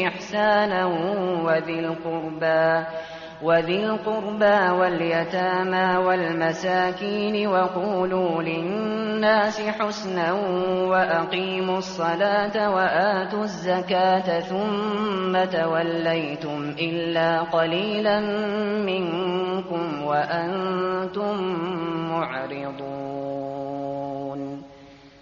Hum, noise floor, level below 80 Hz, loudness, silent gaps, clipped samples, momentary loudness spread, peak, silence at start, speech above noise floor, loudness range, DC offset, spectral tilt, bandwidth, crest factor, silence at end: none; -47 dBFS; -60 dBFS; -23 LUFS; none; under 0.1%; 9 LU; -6 dBFS; 0 s; 24 dB; 4 LU; under 0.1%; -3.5 dB/octave; 7.2 kHz; 16 dB; 0.15 s